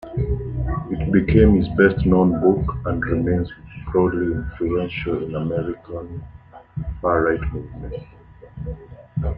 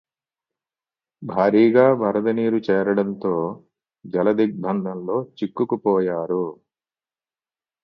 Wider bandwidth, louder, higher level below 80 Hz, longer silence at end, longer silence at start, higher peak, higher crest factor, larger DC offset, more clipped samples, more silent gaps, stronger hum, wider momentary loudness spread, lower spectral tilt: second, 4.7 kHz vs 6 kHz; about the same, -20 LUFS vs -21 LUFS; first, -32 dBFS vs -66 dBFS; second, 0 s vs 1.3 s; second, 0.05 s vs 1.2 s; about the same, -2 dBFS vs -2 dBFS; about the same, 18 dB vs 20 dB; neither; neither; neither; neither; first, 18 LU vs 12 LU; first, -11 dB/octave vs -9.5 dB/octave